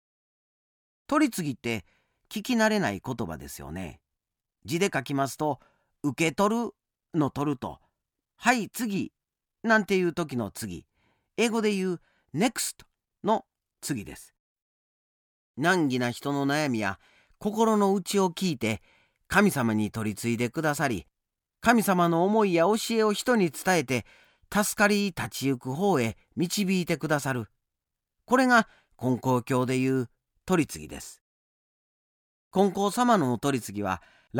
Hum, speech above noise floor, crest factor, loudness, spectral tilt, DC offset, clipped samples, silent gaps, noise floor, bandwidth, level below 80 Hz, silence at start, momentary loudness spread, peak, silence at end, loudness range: none; 60 dB; 20 dB; -27 LUFS; -5 dB/octave; under 0.1%; under 0.1%; 14.40-14.55 s, 14.62-15.54 s, 31.21-32.51 s; -86 dBFS; 19.5 kHz; -60 dBFS; 1.1 s; 14 LU; -8 dBFS; 0 s; 6 LU